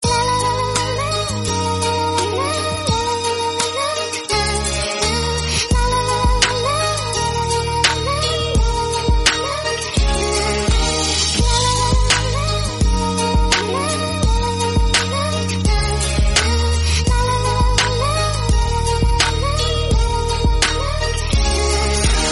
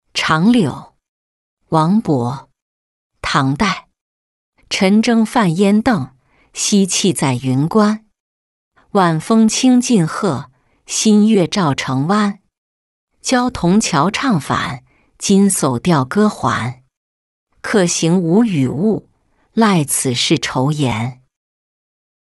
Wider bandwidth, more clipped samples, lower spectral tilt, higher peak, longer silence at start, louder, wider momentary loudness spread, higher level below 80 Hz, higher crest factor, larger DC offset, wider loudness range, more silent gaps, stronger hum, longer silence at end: about the same, 11.5 kHz vs 12 kHz; neither; second, -3.5 dB/octave vs -5 dB/octave; about the same, 0 dBFS vs -2 dBFS; second, 0 s vs 0.15 s; about the same, -17 LUFS vs -15 LUFS; second, 4 LU vs 11 LU; first, -22 dBFS vs -48 dBFS; about the same, 16 dB vs 14 dB; neither; about the same, 2 LU vs 3 LU; second, none vs 1.08-1.57 s, 2.62-3.10 s, 4.01-4.53 s, 8.20-8.71 s, 12.58-13.07 s, 16.97-17.47 s; neither; second, 0 s vs 1.15 s